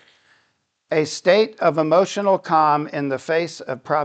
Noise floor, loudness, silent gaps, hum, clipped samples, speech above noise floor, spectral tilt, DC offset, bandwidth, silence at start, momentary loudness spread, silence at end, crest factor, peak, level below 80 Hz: -68 dBFS; -19 LUFS; none; none; under 0.1%; 49 dB; -5 dB/octave; under 0.1%; 9 kHz; 0.9 s; 8 LU; 0 s; 18 dB; -2 dBFS; -76 dBFS